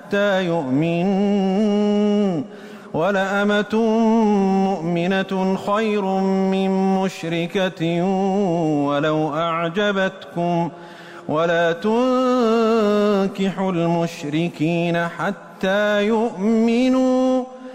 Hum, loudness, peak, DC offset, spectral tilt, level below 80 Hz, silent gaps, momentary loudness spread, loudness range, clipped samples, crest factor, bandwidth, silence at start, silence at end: none; -20 LUFS; -10 dBFS; under 0.1%; -7 dB/octave; -58 dBFS; none; 6 LU; 2 LU; under 0.1%; 10 dB; 10 kHz; 0 s; 0 s